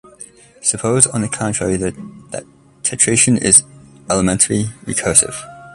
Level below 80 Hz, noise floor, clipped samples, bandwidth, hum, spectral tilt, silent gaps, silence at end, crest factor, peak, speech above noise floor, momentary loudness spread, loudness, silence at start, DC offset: -44 dBFS; -41 dBFS; under 0.1%; 16 kHz; none; -3.5 dB/octave; none; 0 s; 18 dB; 0 dBFS; 24 dB; 19 LU; -14 LUFS; 0.2 s; under 0.1%